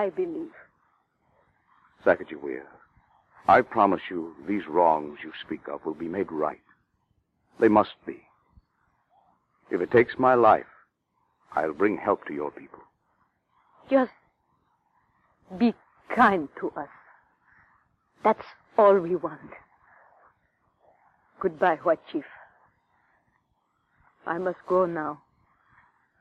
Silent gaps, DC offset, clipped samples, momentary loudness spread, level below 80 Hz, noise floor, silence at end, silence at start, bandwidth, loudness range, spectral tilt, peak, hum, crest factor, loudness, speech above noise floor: none; under 0.1%; under 0.1%; 19 LU; -66 dBFS; -73 dBFS; 1.05 s; 0 s; 7.6 kHz; 7 LU; -8 dB/octave; -6 dBFS; none; 22 dB; -25 LUFS; 49 dB